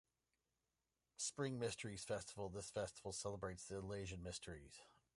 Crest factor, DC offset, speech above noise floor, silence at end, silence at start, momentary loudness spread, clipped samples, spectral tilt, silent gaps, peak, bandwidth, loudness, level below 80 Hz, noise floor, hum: 18 dB; under 0.1%; over 41 dB; 0.25 s; 1.2 s; 11 LU; under 0.1%; -4 dB/octave; none; -32 dBFS; 11.5 kHz; -48 LUFS; -68 dBFS; under -90 dBFS; none